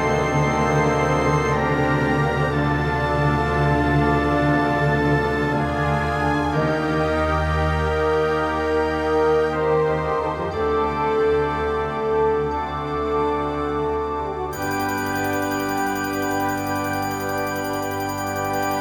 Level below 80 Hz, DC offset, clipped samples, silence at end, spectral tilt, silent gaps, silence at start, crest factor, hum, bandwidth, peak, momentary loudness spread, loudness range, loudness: -34 dBFS; under 0.1%; under 0.1%; 0 s; -6 dB/octave; none; 0 s; 14 dB; none; over 20 kHz; -6 dBFS; 5 LU; 4 LU; -21 LUFS